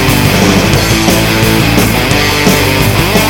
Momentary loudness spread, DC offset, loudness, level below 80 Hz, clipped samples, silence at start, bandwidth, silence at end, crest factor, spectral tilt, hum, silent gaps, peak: 1 LU; under 0.1%; -8 LUFS; -22 dBFS; 0.1%; 0 s; 17.5 kHz; 0 s; 8 dB; -4.5 dB/octave; none; none; 0 dBFS